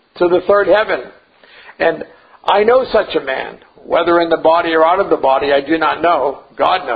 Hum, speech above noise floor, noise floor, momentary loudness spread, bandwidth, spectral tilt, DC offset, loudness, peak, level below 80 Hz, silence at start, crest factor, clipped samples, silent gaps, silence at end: none; 30 dB; -43 dBFS; 10 LU; 5 kHz; -7 dB/octave; under 0.1%; -14 LUFS; 0 dBFS; -48 dBFS; 0.15 s; 14 dB; under 0.1%; none; 0 s